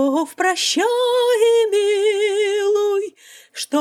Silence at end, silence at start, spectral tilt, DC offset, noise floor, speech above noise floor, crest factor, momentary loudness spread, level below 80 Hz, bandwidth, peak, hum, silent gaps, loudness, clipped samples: 0 s; 0 s; -0.5 dB/octave; under 0.1%; -39 dBFS; 22 dB; 12 dB; 8 LU; -84 dBFS; 15.5 kHz; -6 dBFS; none; none; -18 LUFS; under 0.1%